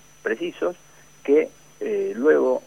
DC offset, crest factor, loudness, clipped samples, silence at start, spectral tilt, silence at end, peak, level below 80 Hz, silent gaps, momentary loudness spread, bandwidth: 0.2%; 18 dB; -23 LUFS; under 0.1%; 0.25 s; -5 dB/octave; 0.05 s; -6 dBFS; -66 dBFS; none; 14 LU; 11 kHz